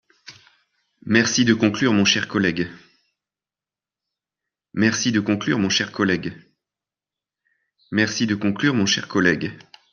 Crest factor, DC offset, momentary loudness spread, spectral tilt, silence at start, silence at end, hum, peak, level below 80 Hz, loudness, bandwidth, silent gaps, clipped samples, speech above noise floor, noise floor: 22 dB; under 0.1%; 9 LU; -4 dB/octave; 0.25 s; 0.35 s; 50 Hz at -45 dBFS; -2 dBFS; -62 dBFS; -20 LUFS; 7.4 kHz; none; under 0.1%; over 70 dB; under -90 dBFS